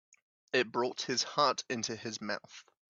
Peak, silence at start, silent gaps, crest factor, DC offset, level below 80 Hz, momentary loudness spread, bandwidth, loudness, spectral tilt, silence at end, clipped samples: -14 dBFS; 0.55 s; none; 22 dB; under 0.1%; -80 dBFS; 10 LU; 7.8 kHz; -33 LUFS; -2.5 dB/octave; 0.3 s; under 0.1%